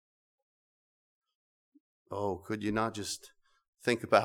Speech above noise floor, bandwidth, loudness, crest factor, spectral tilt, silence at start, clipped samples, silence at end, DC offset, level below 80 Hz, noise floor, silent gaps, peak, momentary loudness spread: over 58 dB; 18.5 kHz; -34 LUFS; 24 dB; -4.5 dB/octave; 2.1 s; under 0.1%; 0 s; under 0.1%; -66 dBFS; under -90 dBFS; 3.68-3.73 s; -10 dBFS; 8 LU